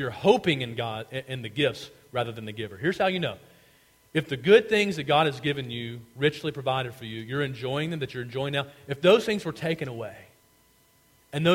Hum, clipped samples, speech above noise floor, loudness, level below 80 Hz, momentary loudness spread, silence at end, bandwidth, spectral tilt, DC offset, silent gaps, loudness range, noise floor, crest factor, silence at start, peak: none; under 0.1%; 35 dB; -27 LUFS; -62 dBFS; 14 LU; 0 s; 16.5 kHz; -5.5 dB/octave; under 0.1%; none; 5 LU; -62 dBFS; 22 dB; 0 s; -6 dBFS